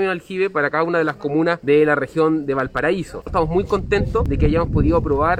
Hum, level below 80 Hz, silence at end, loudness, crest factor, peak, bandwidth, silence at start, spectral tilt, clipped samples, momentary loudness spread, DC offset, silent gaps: none; -30 dBFS; 0 s; -19 LUFS; 14 dB; -4 dBFS; 10.5 kHz; 0 s; -8 dB/octave; under 0.1%; 6 LU; under 0.1%; none